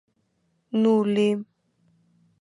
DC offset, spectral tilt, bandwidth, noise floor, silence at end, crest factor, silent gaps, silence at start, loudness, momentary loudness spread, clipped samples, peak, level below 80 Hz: under 0.1%; -7.5 dB/octave; 10.5 kHz; -71 dBFS; 0.95 s; 16 dB; none; 0.75 s; -23 LUFS; 9 LU; under 0.1%; -10 dBFS; -76 dBFS